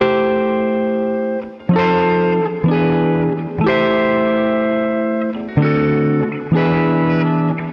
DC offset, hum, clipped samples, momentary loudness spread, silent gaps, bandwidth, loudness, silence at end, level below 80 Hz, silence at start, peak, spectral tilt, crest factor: under 0.1%; none; under 0.1%; 5 LU; none; 5.6 kHz; -16 LUFS; 0 s; -46 dBFS; 0 s; -4 dBFS; -9.5 dB/octave; 12 dB